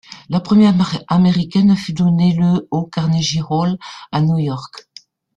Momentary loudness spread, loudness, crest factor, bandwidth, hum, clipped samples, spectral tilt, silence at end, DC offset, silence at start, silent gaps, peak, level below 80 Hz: 10 LU; -16 LUFS; 14 dB; 8 kHz; none; under 0.1%; -7 dB/octave; 0.55 s; under 0.1%; 0.1 s; none; -2 dBFS; -50 dBFS